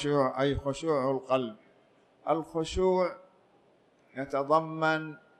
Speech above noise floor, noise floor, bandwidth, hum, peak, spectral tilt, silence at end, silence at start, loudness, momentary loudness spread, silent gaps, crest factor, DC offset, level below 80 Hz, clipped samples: 36 dB; -64 dBFS; 11 kHz; none; -12 dBFS; -6 dB/octave; 0.25 s; 0 s; -30 LUFS; 13 LU; none; 20 dB; under 0.1%; -52 dBFS; under 0.1%